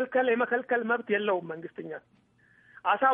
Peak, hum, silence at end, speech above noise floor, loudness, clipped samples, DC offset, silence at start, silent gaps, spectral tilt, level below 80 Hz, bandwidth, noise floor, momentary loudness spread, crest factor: -10 dBFS; none; 0 s; 33 dB; -28 LUFS; under 0.1%; under 0.1%; 0 s; none; -8 dB/octave; -80 dBFS; 3.8 kHz; -61 dBFS; 15 LU; 18 dB